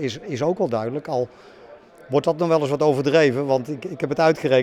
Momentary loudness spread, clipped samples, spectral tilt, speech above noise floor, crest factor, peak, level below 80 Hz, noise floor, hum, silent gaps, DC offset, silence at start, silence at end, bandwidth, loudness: 9 LU; under 0.1%; -6.5 dB/octave; 25 dB; 16 dB; -4 dBFS; -64 dBFS; -45 dBFS; none; none; under 0.1%; 0 s; 0 s; 13 kHz; -21 LUFS